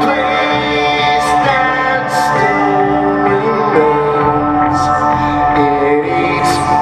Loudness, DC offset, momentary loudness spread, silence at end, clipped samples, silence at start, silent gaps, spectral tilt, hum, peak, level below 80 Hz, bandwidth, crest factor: -12 LUFS; under 0.1%; 2 LU; 0 s; under 0.1%; 0 s; none; -5 dB/octave; none; 0 dBFS; -38 dBFS; 15 kHz; 12 dB